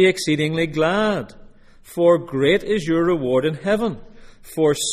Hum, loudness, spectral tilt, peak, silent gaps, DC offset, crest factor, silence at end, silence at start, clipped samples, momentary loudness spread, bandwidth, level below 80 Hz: none; -20 LUFS; -5 dB/octave; -4 dBFS; none; under 0.1%; 16 dB; 0 s; 0 s; under 0.1%; 10 LU; 15.5 kHz; -48 dBFS